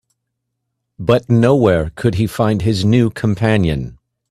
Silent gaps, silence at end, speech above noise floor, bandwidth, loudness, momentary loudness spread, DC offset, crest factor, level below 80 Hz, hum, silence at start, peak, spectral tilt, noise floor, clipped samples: none; 0.35 s; 61 dB; 13.5 kHz; -15 LUFS; 7 LU; under 0.1%; 16 dB; -38 dBFS; none; 1 s; 0 dBFS; -7.5 dB/octave; -75 dBFS; under 0.1%